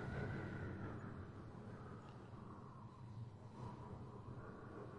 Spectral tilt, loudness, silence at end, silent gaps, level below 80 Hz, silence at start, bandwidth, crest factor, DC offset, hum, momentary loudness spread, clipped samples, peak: -8 dB/octave; -53 LUFS; 0 s; none; -66 dBFS; 0 s; 10.5 kHz; 16 dB; under 0.1%; none; 9 LU; under 0.1%; -34 dBFS